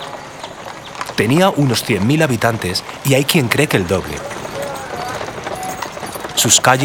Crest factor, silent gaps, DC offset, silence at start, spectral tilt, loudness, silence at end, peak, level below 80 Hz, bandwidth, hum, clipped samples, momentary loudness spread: 18 dB; none; under 0.1%; 0 s; -3.5 dB/octave; -16 LUFS; 0 s; 0 dBFS; -46 dBFS; over 20 kHz; none; under 0.1%; 15 LU